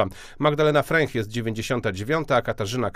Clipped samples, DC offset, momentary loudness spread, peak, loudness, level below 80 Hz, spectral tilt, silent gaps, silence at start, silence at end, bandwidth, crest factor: under 0.1%; under 0.1%; 8 LU; -6 dBFS; -23 LUFS; -46 dBFS; -5.5 dB/octave; none; 0 s; 0.05 s; 15.5 kHz; 18 dB